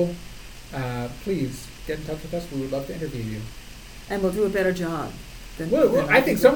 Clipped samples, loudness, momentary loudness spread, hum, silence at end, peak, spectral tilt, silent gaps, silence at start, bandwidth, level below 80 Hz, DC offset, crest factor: under 0.1%; -25 LUFS; 22 LU; none; 0 s; -2 dBFS; -6 dB/octave; none; 0 s; 19 kHz; -42 dBFS; under 0.1%; 22 dB